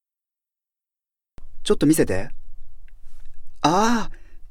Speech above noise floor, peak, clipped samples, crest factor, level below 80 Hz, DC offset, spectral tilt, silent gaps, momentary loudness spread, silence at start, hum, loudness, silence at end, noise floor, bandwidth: 71 dB; -4 dBFS; under 0.1%; 20 dB; -38 dBFS; under 0.1%; -5 dB/octave; none; 16 LU; 1.4 s; none; -21 LUFS; 0.05 s; -89 dBFS; 16 kHz